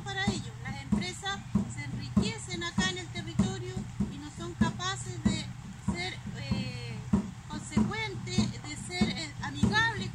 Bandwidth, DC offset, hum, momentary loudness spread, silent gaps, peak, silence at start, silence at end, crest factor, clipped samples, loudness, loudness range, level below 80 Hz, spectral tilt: 11.5 kHz; under 0.1%; none; 9 LU; none; -14 dBFS; 0 s; 0 s; 20 dB; under 0.1%; -33 LUFS; 2 LU; -48 dBFS; -5 dB/octave